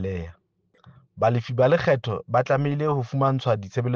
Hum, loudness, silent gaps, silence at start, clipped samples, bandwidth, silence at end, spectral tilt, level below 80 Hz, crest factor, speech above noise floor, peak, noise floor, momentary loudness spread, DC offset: none; -23 LUFS; none; 0 s; under 0.1%; 7 kHz; 0 s; -8 dB/octave; -54 dBFS; 16 dB; 35 dB; -8 dBFS; -57 dBFS; 6 LU; under 0.1%